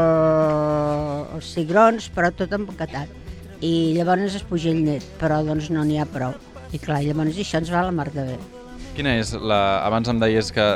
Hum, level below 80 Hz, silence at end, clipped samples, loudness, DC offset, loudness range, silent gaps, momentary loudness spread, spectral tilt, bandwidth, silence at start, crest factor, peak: none; -42 dBFS; 0 s; under 0.1%; -22 LUFS; under 0.1%; 3 LU; none; 14 LU; -6.5 dB/octave; 12.5 kHz; 0 s; 18 dB; -4 dBFS